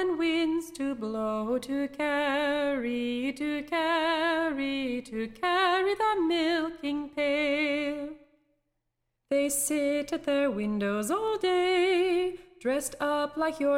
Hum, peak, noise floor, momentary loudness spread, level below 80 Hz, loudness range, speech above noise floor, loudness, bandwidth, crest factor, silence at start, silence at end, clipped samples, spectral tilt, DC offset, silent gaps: none; -14 dBFS; -81 dBFS; 7 LU; -60 dBFS; 3 LU; 53 dB; -28 LUFS; 16 kHz; 14 dB; 0 s; 0 s; under 0.1%; -3 dB/octave; under 0.1%; none